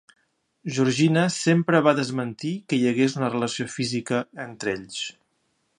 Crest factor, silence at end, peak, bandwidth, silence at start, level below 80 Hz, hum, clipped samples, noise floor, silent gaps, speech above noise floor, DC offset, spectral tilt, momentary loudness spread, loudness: 22 dB; 0.65 s; -4 dBFS; 11.5 kHz; 0.65 s; -66 dBFS; none; under 0.1%; -71 dBFS; none; 48 dB; under 0.1%; -5.5 dB/octave; 12 LU; -24 LUFS